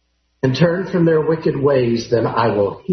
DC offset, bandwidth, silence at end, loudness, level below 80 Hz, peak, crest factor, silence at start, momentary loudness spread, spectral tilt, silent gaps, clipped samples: under 0.1%; 6.4 kHz; 0 s; -17 LUFS; -50 dBFS; -2 dBFS; 16 dB; 0.45 s; 4 LU; -7.5 dB/octave; none; under 0.1%